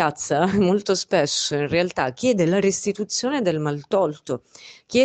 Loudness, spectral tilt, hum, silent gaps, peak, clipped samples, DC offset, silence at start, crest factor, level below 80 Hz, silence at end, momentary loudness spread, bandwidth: -22 LUFS; -4.5 dB/octave; none; none; -6 dBFS; under 0.1%; under 0.1%; 0 s; 16 dB; -56 dBFS; 0 s; 6 LU; 9.2 kHz